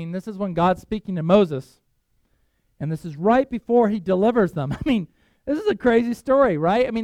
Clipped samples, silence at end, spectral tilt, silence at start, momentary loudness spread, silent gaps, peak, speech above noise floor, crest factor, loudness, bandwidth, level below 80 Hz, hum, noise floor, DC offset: under 0.1%; 0 s; -8 dB/octave; 0 s; 11 LU; none; -2 dBFS; 46 dB; 18 dB; -21 LUFS; 13 kHz; -48 dBFS; none; -66 dBFS; under 0.1%